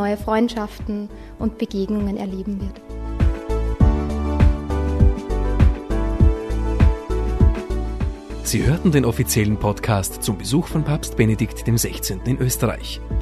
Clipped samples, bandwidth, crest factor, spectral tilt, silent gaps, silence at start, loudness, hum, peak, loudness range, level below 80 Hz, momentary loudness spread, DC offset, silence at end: under 0.1%; 13.5 kHz; 18 dB; -6 dB/octave; none; 0 s; -21 LUFS; none; -2 dBFS; 4 LU; -24 dBFS; 9 LU; under 0.1%; 0 s